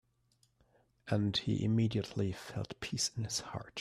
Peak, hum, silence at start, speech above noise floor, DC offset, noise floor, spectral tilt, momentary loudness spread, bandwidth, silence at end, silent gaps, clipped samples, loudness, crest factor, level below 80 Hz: -20 dBFS; none; 1.05 s; 39 dB; under 0.1%; -74 dBFS; -4.5 dB/octave; 10 LU; 14 kHz; 0 s; none; under 0.1%; -35 LUFS; 18 dB; -64 dBFS